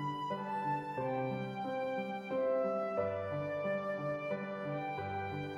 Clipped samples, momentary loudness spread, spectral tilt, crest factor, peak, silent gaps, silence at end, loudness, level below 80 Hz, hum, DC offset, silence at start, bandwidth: under 0.1%; 5 LU; -8 dB/octave; 14 dB; -22 dBFS; none; 0 s; -37 LUFS; -72 dBFS; none; under 0.1%; 0 s; 12 kHz